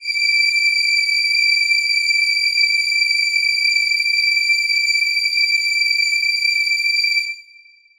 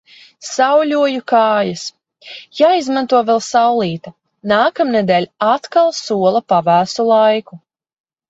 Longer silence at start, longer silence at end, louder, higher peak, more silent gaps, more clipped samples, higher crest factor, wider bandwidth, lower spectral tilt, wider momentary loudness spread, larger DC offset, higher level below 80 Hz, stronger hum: second, 0 s vs 0.4 s; second, 0.55 s vs 0.7 s; about the same, -14 LUFS vs -14 LUFS; second, -6 dBFS vs 0 dBFS; neither; neither; about the same, 12 dB vs 14 dB; first, 19.5 kHz vs 8 kHz; second, 7.5 dB/octave vs -4.5 dB/octave; second, 2 LU vs 14 LU; neither; second, -66 dBFS vs -60 dBFS; neither